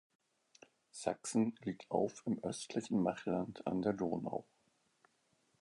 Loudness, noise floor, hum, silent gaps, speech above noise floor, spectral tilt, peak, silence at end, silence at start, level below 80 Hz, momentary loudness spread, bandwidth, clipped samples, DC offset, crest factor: -39 LUFS; -77 dBFS; none; none; 39 dB; -6 dB/octave; -18 dBFS; 1.2 s; 0.95 s; -72 dBFS; 7 LU; 11 kHz; under 0.1%; under 0.1%; 22 dB